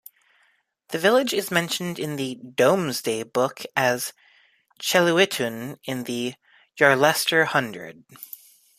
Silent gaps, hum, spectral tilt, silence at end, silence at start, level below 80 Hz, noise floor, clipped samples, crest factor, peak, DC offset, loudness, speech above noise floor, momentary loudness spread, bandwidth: none; none; -3.5 dB/octave; 0.55 s; 0.9 s; -70 dBFS; -66 dBFS; under 0.1%; 22 dB; -2 dBFS; under 0.1%; -22 LUFS; 43 dB; 15 LU; 15.5 kHz